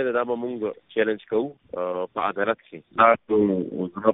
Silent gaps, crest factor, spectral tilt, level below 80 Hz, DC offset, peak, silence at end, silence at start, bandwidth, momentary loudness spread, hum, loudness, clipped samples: none; 20 dB; -4.5 dB/octave; -64 dBFS; under 0.1%; -4 dBFS; 0 s; 0 s; 4 kHz; 12 LU; none; -24 LUFS; under 0.1%